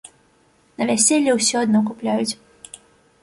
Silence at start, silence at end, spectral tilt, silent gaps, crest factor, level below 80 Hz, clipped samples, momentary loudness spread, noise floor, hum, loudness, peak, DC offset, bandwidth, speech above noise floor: 0.8 s; 0.9 s; -3 dB/octave; none; 20 dB; -64 dBFS; under 0.1%; 24 LU; -58 dBFS; none; -18 LUFS; -2 dBFS; under 0.1%; 11.5 kHz; 40 dB